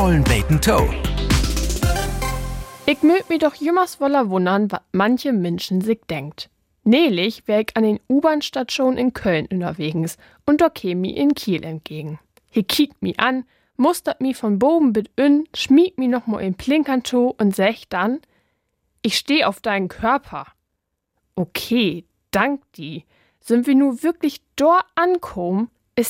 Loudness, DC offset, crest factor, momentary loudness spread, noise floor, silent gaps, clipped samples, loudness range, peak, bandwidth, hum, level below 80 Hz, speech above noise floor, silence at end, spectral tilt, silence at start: -19 LUFS; under 0.1%; 18 dB; 12 LU; -76 dBFS; none; under 0.1%; 4 LU; 0 dBFS; 16.5 kHz; none; -32 dBFS; 58 dB; 0 s; -5.5 dB/octave; 0 s